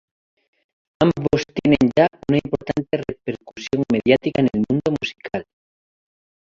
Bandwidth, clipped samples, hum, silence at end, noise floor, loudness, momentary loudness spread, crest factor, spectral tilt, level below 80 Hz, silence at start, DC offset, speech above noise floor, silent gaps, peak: 7.6 kHz; under 0.1%; none; 1.05 s; under -90 dBFS; -20 LUFS; 13 LU; 20 dB; -7 dB/octave; -48 dBFS; 1 s; under 0.1%; over 70 dB; none; -2 dBFS